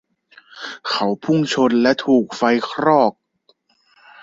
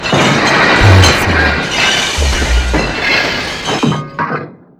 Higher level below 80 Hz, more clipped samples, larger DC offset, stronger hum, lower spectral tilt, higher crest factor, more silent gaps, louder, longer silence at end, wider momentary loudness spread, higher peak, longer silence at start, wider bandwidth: second, -64 dBFS vs -20 dBFS; second, under 0.1% vs 0.3%; neither; neither; first, -5.5 dB/octave vs -4 dB/octave; first, 18 dB vs 12 dB; neither; second, -18 LUFS vs -11 LUFS; first, 1.1 s vs 0.25 s; about the same, 10 LU vs 11 LU; about the same, -2 dBFS vs 0 dBFS; first, 0.55 s vs 0 s; second, 7.8 kHz vs 16 kHz